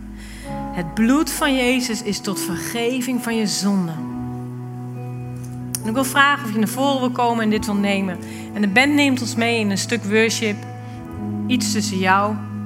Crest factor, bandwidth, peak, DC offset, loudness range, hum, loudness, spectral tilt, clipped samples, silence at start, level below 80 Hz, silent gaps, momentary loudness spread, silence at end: 20 dB; 16 kHz; 0 dBFS; under 0.1%; 5 LU; none; -20 LUFS; -4 dB/octave; under 0.1%; 0 s; -46 dBFS; none; 15 LU; 0 s